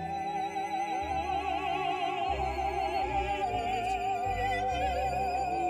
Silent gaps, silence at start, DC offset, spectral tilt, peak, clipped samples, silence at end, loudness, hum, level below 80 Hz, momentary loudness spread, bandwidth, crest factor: none; 0 s; under 0.1%; -5 dB/octave; -20 dBFS; under 0.1%; 0 s; -32 LUFS; none; -46 dBFS; 3 LU; 15 kHz; 12 dB